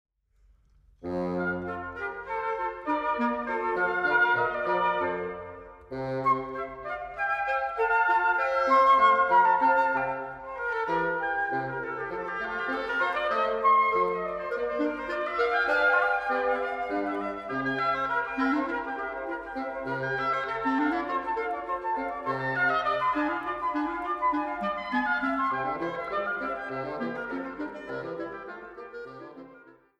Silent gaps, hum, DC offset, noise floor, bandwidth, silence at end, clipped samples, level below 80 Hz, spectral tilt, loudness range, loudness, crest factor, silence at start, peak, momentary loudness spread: none; none; under 0.1%; -63 dBFS; 9.8 kHz; 0.25 s; under 0.1%; -58 dBFS; -6 dB/octave; 7 LU; -27 LUFS; 18 dB; 1 s; -10 dBFS; 13 LU